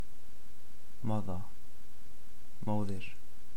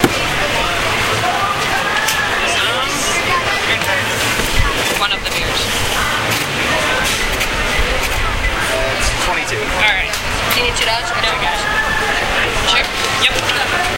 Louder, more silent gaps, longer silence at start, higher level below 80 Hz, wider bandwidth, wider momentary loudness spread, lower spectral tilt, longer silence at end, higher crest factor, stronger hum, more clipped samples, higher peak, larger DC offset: second, -40 LUFS vs -15 LUFS; neither; about the same, 0 s vs 0 s; second, -58 dBFS vs -26 dBFS; first, 18.5 kHz vs 16.5 kHz; first, 23 LU vs 3 LU; first, -7.5 dB/octave vs -2.5 dB/octave; about the same, 0 s vs 0 s; about the same, 20 dB vs 16 dB; neither; neither; second, -18 dBFS vs 0 dBFS; first, 4% vs under 0.1%